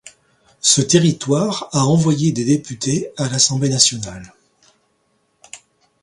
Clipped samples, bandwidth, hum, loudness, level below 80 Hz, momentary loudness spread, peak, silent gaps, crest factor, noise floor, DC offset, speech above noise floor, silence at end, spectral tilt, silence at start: under 0.1%; 11.5 kHz; none; -16 LUFS; -54 dBFS; 8 LU; 0 dBFS; none; 18 dB; -64 dBFS; under 0.1%; 48 dB; 0.45 s; -4 dB/octave; 0.05 s